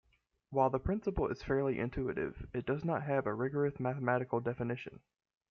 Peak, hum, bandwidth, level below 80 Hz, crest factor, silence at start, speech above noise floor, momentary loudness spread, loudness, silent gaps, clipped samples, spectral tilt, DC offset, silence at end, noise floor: -16 dBFS; none; 6.6 kHz; -54 dBFS; 20 dB; 0.5 s; 27 dB; 7 LU; -35 LUFS; none; under 0.1%; -9 dB/octave; under 0.1%; 0.55 s; -62 dBFS